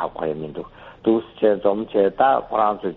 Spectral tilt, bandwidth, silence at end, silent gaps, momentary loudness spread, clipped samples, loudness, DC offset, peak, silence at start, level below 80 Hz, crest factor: -5 dB/octave; 4.2 kHz; 0 s; none; 14 LU; under 0.1%; -21 LUFS; under 0.1%; -4 dBFS; 0 s; -54 dBFS; 16 dB